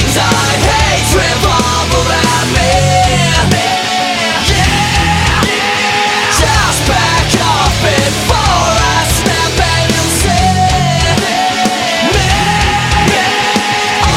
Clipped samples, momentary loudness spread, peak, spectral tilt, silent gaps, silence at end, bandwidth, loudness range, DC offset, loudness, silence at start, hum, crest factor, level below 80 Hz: under 0.1%; 2 LU; 0 dBFS; -3.5 dB/octave; none; 0 s; 16.5 kHz; 1 LU; under 0.1%; -10 LUFS; 0 s; none; 10 dB; -22 dBFS